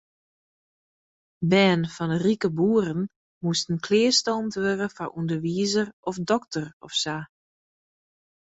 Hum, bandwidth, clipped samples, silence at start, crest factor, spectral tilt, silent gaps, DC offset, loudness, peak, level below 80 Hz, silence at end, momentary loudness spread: none; 8.2 kHz; under 0.1%; 1.4 s; 20 dB; -4.5 dB/octave; 3.16-3.41 s, 5.93-6.03 s, 6.73-6.80 s; under 0.1%; -25 LUFS; -6 dBFS; -64 dBFS; 1.3 s; 12 LU